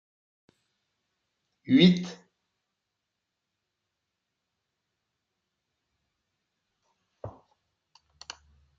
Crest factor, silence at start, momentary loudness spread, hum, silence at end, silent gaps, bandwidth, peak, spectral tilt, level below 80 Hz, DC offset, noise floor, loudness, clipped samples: 26 dB; 1.7 s; 26 LU; none; 1.5 s; none; 7.4 kHz; -6 dBFS; -6.5 dB/octave; -68 dBFS; under 0.1%; -84 dBFS; -22 LUFS; under 0.1%